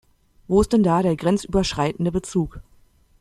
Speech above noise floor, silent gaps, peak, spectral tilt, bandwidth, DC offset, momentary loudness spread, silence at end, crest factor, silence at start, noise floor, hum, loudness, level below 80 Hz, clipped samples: 35 dB; none; -6 dBFS; -6.5 dB/octave; 13 kHz; under 0.1%; 8 LU; 0.6 s; 16 dB; 0.5 s; -55 dBFS; none; -21 LUFS; -40 dBFS; under 0.1%